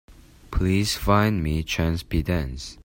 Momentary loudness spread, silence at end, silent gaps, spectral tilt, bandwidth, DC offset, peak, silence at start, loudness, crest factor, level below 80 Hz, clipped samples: 7 LU; 0.1 s; none; -5.5 dB/octave; 16.5 kHz; under 0.1%; -4 dBFS; 0.1 s; -24 LUFS; 20 dB; -34 dBFS; under 0.1%